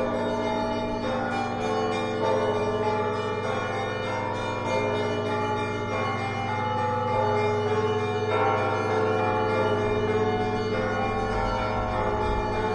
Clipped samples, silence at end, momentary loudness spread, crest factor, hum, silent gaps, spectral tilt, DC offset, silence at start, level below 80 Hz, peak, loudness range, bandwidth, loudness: under 0.1%; 0 s; 4 LU; 14 dB; none; none; -6.5 dB/octave; under 0.1%; 0 s; -42 dBFS; -12 dBFS; 3 LU; 11 kHz; -26 LUFS